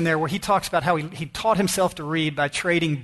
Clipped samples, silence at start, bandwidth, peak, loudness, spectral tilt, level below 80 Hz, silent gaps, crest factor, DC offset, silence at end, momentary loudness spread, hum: under 0.1%; 0 s; 12.5 kHz; -6 dBFS; -23 LUFS; -4.5 dB/octave; -52 dBFS; none; 16 dB; under 0.1%; 0 s; 4 LU; none